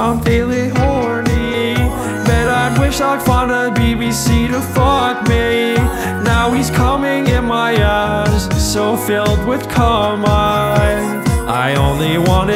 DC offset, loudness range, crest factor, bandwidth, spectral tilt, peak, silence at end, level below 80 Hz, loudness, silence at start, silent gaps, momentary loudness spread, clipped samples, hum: under 0.1%; 1 LU; 14 dB; 16.5 kHz; -5.5 dB/octave; 0 dBFS; 0 s; -22 dBFS; -14 LUFS; 0 s; none; 3 LU; under 0.1%; none